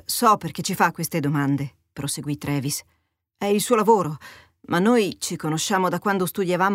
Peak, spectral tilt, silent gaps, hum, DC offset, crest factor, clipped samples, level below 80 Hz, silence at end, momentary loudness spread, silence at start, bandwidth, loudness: -4 dBFS; -4.5 dB/octave; none; none; under 0.1%; 20 dB; under 0.1%; -60 dBFS; 0 s; 10 LU; 0.1 s; 16 kHz; -22 LUFS